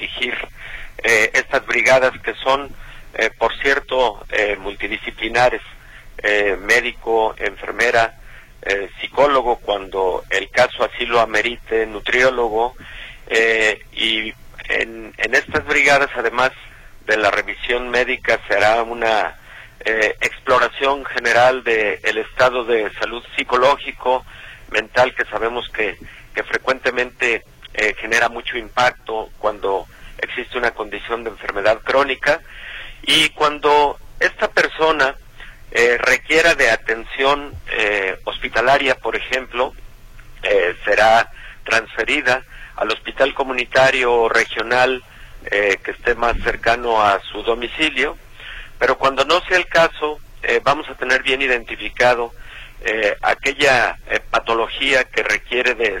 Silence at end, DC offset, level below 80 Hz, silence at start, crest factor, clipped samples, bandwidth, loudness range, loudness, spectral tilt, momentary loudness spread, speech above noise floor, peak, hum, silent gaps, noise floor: 0 s; under 0.1%; -40 dBFS; 0 s; 18 dB; under 0.1%; 16.5 kHz; 3 LU; -17 LUFS; -2.5 dB/octave; 11 LU; 21 dB; -2 dBFS; none; none; -38 dBFS